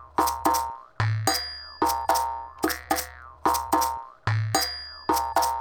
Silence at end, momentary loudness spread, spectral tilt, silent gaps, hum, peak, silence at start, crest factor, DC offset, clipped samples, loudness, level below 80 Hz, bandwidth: 0 s; 8 LU; -3.5 dB/octave; none; none; -8 dBFS; 0 s; 20 dB; under 0.1%; under 0.1%; -26 LUFS; -48 dBFS; 19 kHz